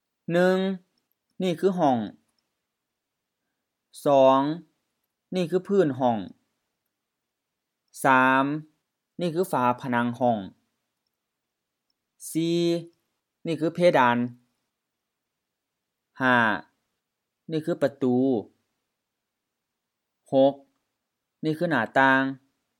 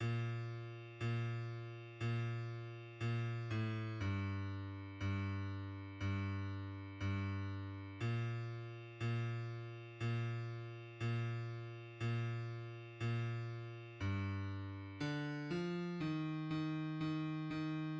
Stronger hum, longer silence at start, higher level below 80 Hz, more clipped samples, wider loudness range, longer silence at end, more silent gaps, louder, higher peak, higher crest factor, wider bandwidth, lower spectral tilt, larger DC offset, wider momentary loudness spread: neither; first, 0.3 s vs 0 s; second, -80 dBFS vs -72 dBFS; neither; first, 5 LU vs 1 LU; first, 0.45 s vs 0 s; neither; first, -24 LUFS vs -43 LUFS; first, -6 dBFS vs -30 dBFS; first, 22 dB vs 12 dB; first, 18 kHz vs 7.4 kHz; second, -6 dB/octave vs -7.5 dB/octave; neither; first, 13 LU vs 8 LU